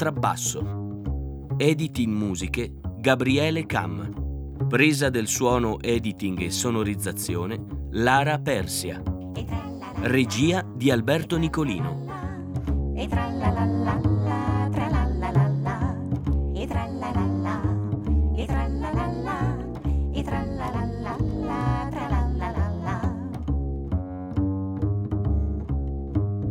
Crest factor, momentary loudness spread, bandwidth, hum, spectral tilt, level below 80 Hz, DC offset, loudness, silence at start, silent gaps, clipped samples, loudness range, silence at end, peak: 22 dB; 9 LU; over 20 kHz; none; -5.5 dB/octave; -34 dBFS; under 0.1%; -26 LUFS; 0 s; none; under 0.1%; 4 LU; 0 s; -4 dBFS